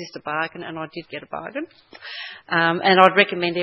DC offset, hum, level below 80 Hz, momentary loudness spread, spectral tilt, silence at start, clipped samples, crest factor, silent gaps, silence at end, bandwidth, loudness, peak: under 0.1%; none; -70 dBFS; 20 LU; -6 dB/octave; 0 s; under 0.1%; 22 dB; none; 0 s; 8 kHz; -18 LUFS; 0 dBFS